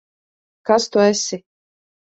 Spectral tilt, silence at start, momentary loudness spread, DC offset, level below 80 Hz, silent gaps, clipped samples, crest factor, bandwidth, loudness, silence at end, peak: -3.5 dB/octave; 0.65 s; 16 LU; under 0.1%; -68 dBFS; none; under 0.1%; 20 dB; 8.2 kHz; -18 LUFS; 0.75 s; -2 dBFS